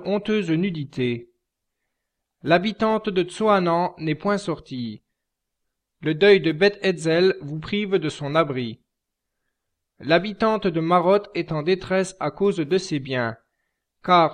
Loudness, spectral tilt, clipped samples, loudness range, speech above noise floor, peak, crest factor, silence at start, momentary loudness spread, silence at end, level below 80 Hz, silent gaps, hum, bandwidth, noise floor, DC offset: -22 LUFS; -6 dB/octave; under 0.1%; 4 LU; 60 dB; -4 dBFS; 20 dB; 0 s; 12 LU; 0 s; -56 dBFS; none; none; 10 kHz; -81 dBFS; under 0.1%